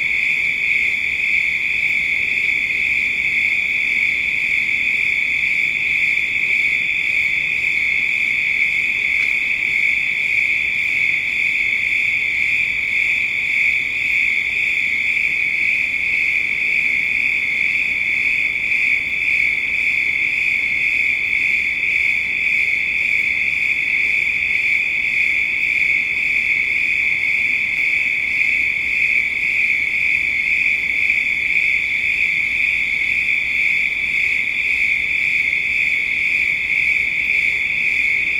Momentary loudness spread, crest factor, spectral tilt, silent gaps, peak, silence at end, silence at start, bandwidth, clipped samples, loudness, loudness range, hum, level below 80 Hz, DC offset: 1 LU; 14 dB; -1.5 dB/octave; none; -4 dBFS; 0 s; 0 s; 16 kHz; under 0.1%; -15 LUFS; 0 LU; none; -48 dBFS; under 0.1%